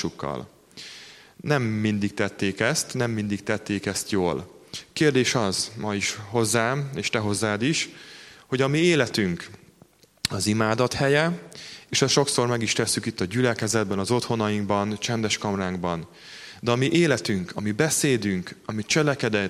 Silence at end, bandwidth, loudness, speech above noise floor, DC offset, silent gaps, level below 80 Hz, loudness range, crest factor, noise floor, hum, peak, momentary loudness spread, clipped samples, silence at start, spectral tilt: 0 s; 15.5 kHz; -24 LUFS; 32 dB; under 0.1%; none; -58 dBFS; 3 LU; 20 dB; -56 dBFS; none; -4 dBFS; 15 LU; under 0.1%; 0 s; -4 dB/octave